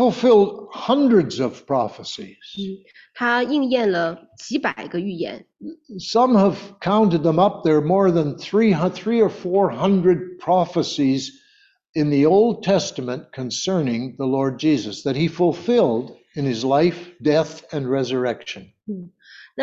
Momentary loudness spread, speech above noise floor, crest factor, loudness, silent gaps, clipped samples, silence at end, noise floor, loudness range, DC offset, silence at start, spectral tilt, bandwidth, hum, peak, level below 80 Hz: 16 LU; 38 dB; 16 dB; -20 LUFS; 11.89-11.93 s; under 0.1%; 0 s; -58 dBFS; 5 LU; under 0.1%; 0 s; -6 dB/octave; 7.8 kHz; none; -4 dBFS; -60 dBFS